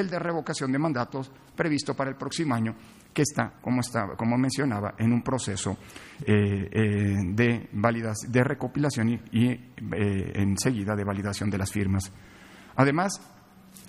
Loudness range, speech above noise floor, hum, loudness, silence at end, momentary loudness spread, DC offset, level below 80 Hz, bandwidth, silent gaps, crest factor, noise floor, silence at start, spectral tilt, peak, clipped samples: 3 LU; 24 dB; none; -27 LUFS; 0 s; 9 LU; under 0.1%; -56 dBFS; 13.5 kHz; none; 20 dB; -51 dBFS; 0 s; -6 dB/octave; -6 dBFS; under 0.1%